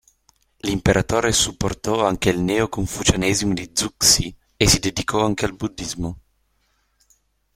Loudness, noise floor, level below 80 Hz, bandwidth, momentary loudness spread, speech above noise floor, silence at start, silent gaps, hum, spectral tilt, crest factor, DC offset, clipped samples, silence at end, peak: -20 LUFS; -66 dBFS; -38 dBFS; 16.5 kHz; 12 LU; 46 dB; 0.65 s; none; none; -3.5 dB/octave; 20 dB; under 0.1%; under 0.1%; 1.35 s; -2 dBFS